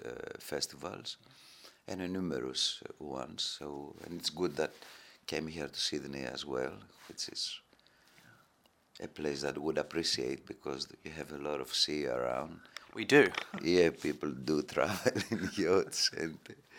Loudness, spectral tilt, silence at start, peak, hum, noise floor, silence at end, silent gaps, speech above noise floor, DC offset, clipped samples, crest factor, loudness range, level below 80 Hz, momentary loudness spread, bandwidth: -34 LUFS; -3.5 dB/octave; 0 s; -12 dBFS; none; -70 dBFS; 0 s; none; 35 dB; under 0.1%; under 0.1%; 24 dB; 8 LU; -68 dBFS; 16 LU; 17 kHz